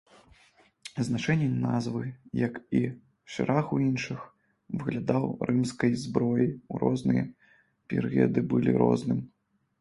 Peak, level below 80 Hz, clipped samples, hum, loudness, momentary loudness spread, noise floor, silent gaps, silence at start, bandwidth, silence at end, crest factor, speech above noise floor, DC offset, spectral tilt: -8 dBFS; -60 dBFS; under 0.1%; none; -28 LUFS; 11 LU; -62 dBFS; none; 0.85 s; 11.5 kHz; 0.55 s; 20 dB; 35 dB; under 0.1%; -7.5 dB/octave